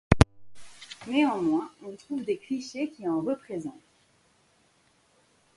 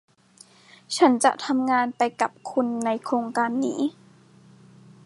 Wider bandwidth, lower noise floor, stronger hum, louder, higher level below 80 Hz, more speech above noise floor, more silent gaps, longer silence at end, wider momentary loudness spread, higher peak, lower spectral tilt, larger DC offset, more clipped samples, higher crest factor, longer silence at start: about the same, 11.5 kHz vs 11.5 kHz; first, -66 dBFS vs -54 dBFS; neither; second, -29 LUFS vs -24 LUFS; first, -40 dBFS vs -80 dBFS; first, 36 dB vs 31 dB; neither; first, 1.85 s vs 1.15 s; first, 18 LU vs 8 LU; first, 0 dBFS vs -4 dBFS; first, -6.5 dB/octave vs -3.5 dB/octave; neither; neither; first, 30 dB vs 20 dB; second, 0.1 s vs 0.9 s